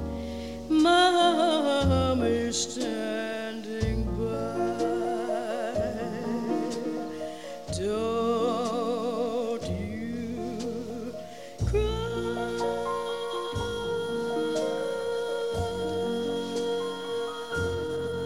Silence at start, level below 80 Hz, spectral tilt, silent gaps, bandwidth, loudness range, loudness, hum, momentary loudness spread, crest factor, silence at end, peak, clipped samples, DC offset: 0 s; -44 dBFS; -5 dB/octave; none; 16 kHz; 7 LU; -29 LUFS; none; 10 LU; 20 dB; 0 s; -8 dBFS; under 0.1%; 0.3%